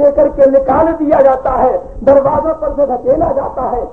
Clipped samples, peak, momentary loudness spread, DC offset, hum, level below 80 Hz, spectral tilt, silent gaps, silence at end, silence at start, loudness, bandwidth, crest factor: under 0.1%; 0 dBFS; 7 LU; 0.9%; none; -32 dBFS; -9.5 dB/octave; none; 0 s; 0 s; -12 LUFS; 3.4 kHz; 12 dB